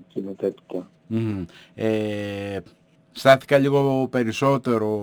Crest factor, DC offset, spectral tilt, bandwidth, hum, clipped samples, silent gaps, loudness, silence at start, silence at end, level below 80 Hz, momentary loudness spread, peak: 20 dB; under 0.1%; -6.5 dB/octave; over 20 kHz; none; under 0.1%; none; -22 LUFS; 0 s; 0 s; -60 dBFS; 17 LU; -2 dBFS